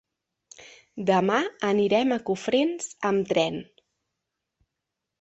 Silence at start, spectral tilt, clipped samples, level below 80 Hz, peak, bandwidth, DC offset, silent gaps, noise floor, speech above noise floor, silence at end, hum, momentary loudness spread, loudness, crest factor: 0.6 s; -5 dB/octave; under 0.1%; -68 dBFS; -8 dBFS; 8.4 kHz; under 0.1%; none; -84 dBFS; 60 dB; 1.6 s; none; 8 LU; -25 LUFS; 20 dB